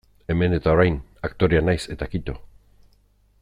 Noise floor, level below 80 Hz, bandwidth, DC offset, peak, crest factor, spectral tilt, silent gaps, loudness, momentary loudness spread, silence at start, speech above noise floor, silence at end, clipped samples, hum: -59 dBFS; -38 dBFS; 11 kHz; under 0.1%; -4 dBFS; 18 dB; -7.5 dB/octave; none; -22 LUFS; 13 LU; 0.3 s; 38 dB; 0.95 s; under 0.1%; 50 Hz at -50 dBFS